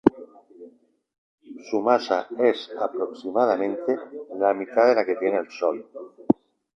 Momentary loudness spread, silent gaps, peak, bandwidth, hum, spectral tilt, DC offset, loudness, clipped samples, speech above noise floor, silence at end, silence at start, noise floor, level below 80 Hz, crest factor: 10 LU; 1.18-1.38 s; 0 dBFS; 7.2 kHz; none; -6.5 dB/octave; under 0.1%; -24 LUFS; under 0.1%; 29 dB; 0.45 s; 0.05 s; -52 dBFS; -62 dBFS; 24 dB